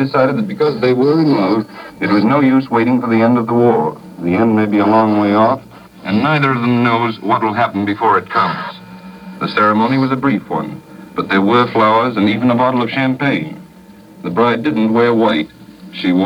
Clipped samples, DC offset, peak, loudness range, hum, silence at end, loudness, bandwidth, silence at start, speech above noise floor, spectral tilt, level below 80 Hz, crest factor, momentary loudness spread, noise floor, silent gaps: under 0.1%; under 0.1%; 0 dBFS; 3 LU; none; 0 s; -14 LUFS; 11 kHz; 0 s; 26 dB; -8 dB/octave; -56 dBFS; 14 dB; 12 LU; -40 dBFS; none